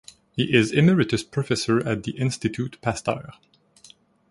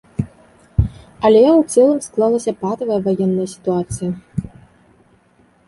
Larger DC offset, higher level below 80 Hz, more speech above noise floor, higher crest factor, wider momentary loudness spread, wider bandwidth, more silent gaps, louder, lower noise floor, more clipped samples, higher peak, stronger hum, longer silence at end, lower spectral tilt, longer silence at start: neither; second, -54 dBFS vs -34 dBFS; second, 31 dB vs 39 dB; first, 22 dB vs 16 dB; second, 9 LU vs 15 LU; about the same, 11.5 kHz vs 11.5 kHz; neither; second, -23 LUFS vs -17 LUFS; about the same, -54 dBFS vs -54 dBFS; neither; about the same, -2 dBFS vs -2 dBFS; neither; second, 1 s vs 1.2 s; second, -5.5 dB/octave vs -7 dB/octave; first, 0.35 s vs 0.2 s